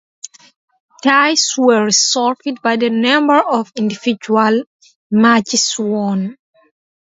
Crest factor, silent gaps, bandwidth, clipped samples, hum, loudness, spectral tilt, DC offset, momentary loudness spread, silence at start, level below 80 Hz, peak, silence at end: 16 dB; 4.67-4.79 s, 4.95-5.10 s; 8 kHz; under 0.1%; none; -14 LUFS; -3 dB/octave; under 0.1%; 9 LU; 1.05 s; -64 dBFS; 0 dBFS; 0.7 s